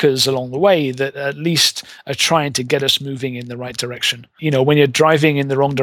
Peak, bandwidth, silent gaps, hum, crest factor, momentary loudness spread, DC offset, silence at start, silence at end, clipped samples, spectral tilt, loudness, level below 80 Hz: 0 dBFS; 19 kHz; none; none; 16 dB; 12 LU; under 0.1%; 0 s; 0 s; under 0.1%; -4 dB/octave; -16 LUFS; -58 dBFS